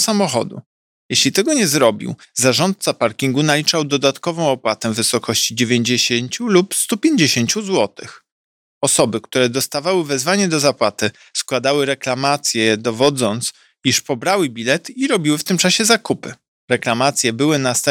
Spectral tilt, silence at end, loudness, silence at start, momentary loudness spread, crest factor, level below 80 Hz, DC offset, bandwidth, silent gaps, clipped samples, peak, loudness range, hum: -3.5 dB/octave; 0 s; -16 LUFS; 0 s; 6 LU; 16 dB; -64 dBFS; under 0.1%; 18.5 kHz; 0.66-1.09 s, 8.32-8.81 s, 16.48-16.68 s; under 0.1%; 0 dBFS; 2 LU; none